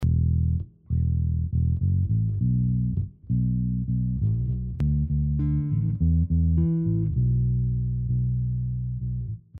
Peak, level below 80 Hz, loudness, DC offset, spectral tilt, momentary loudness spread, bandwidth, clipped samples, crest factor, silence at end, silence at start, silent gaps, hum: -14 dBFS; -32 dBFS; -25 LUFS; under 0.1%; -14 dB/octave; 6 LU; 1.6 kHz; under 0.1%; 10 dB; 0 s; 0 s; none; none